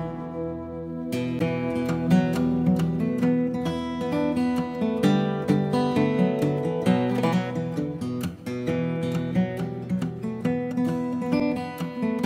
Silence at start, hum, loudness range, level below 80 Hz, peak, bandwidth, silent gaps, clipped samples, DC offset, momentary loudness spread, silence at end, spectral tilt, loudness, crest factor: 0 s; none; 4 LU; -54 dBFS; -8 dBFS; 15.5 kHz; none; under 0.1%; under 0.1%; 9 LU; 0 s; -7.5 dB/octave; -25 LUFS; 16 dB